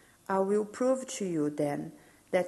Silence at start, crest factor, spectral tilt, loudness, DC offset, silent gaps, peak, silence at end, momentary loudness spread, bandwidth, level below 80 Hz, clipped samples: 0.3 s; 16 dB; -5.5 dB/octave; -31 LUFS; under 0.1%; none; -14 dBFS; 0 s; 5 LU; 12.5 kHz; -74 dBFS; under 0.1%